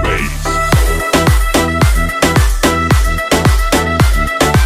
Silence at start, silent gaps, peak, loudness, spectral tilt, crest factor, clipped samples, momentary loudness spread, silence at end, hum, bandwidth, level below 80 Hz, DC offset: 0 s; none; 0 dBFS; -12 LUFS; -4.5 dB/octave; 12 dB; under 0.1%; 2 LU; 0 s; none; 16 kHz; -16 dBFS; under 0.1%